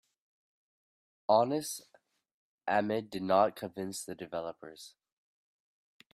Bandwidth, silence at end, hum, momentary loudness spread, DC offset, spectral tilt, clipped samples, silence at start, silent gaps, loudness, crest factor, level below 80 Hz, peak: 15.5 kHz; 1.25 s; none; 19 LU; under 0.1%; -4.5 dB/octave; under 0.1%; 1.3 s; 2.32-2.58 s; -32 LUFS; 24 dB; -76 dBFS; -12 dBFS